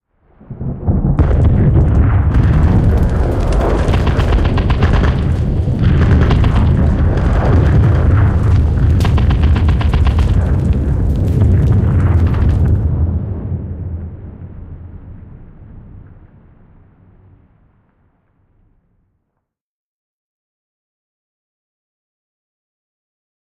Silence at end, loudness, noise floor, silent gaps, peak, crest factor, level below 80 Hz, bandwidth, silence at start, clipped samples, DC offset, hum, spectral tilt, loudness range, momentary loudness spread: 7.55 s; -13 LUFS; -74 dBFS; none; -2 dBFS; 12 dB; -18 dBFS; 7.8 kHz; 0.5 s; under 0.1%; under 0.1%; none; -8.5 dB/octave; 8 LU; 13 LU